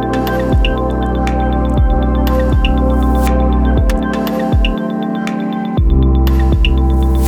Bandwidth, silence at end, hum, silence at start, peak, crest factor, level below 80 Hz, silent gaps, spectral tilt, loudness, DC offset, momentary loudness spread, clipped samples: 15 kHz; 0 s; none; 0 s; -2 dBFS; 10 dB; -14 dBFS; none; -7.5 dB/octave; -14 LUFS; under 0.1%; 5 LU; under 0.1%